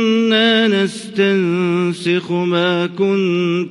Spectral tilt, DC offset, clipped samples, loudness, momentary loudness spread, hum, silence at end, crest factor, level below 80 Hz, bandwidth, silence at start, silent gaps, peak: -6 dB/octave; under 0.1%; under 0.1%; -16 LUFS; 5 LU; none; 0 s; 14 dB; -64 dBFS; 11.5 kHz; 0 s; none; 0 dBFS